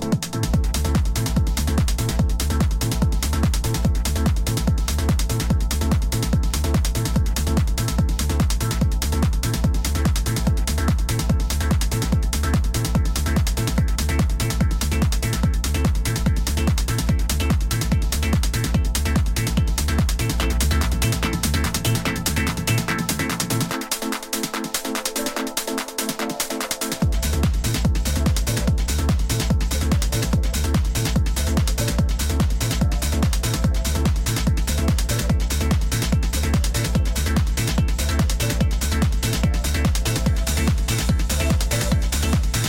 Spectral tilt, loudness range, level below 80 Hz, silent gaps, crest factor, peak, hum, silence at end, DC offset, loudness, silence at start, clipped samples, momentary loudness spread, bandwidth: -4.5 dB/octave; 1 LU; -22 dBFS; none; 14 dB; -6 dBFS; none; 0 s; under 0.1%; -22 LUFS; 0 s; under 0.1%; 1 LU; 17 kHz